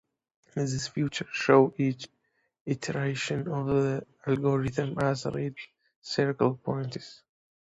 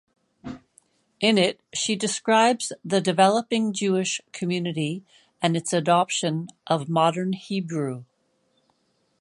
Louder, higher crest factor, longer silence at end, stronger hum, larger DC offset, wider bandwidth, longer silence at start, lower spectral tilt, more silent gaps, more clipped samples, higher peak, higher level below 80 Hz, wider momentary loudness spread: second, -29 LUFS vs -23 LUFS; about the same, 22 dB vs 20 dB; second, 0.6 s vs 1.2 s; neither; neither; second, 8 kHz vs 11.5 kHz; about the same, 0.55 s vs 0.45 s; first, -6 dB/octave vs -4.5 dB/octave; first, 2.61-2.66 s, 5.96-6.02 s vs none; neither; second, -8 dBFS vs -4 dBFS; first, -60 dBFS vs -70 dBFS; first, 17 LU vs 13 LU